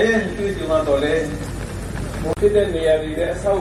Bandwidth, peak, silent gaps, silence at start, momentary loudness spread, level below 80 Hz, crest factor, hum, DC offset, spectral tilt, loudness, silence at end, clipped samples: 14 kHz; -4 dBFS; none; 0 s; 11 LU; -34 dBFS; 14 dB; none; under 0.1%; -6 dB/octave; -20 LUFS; 0 s; under 0.1%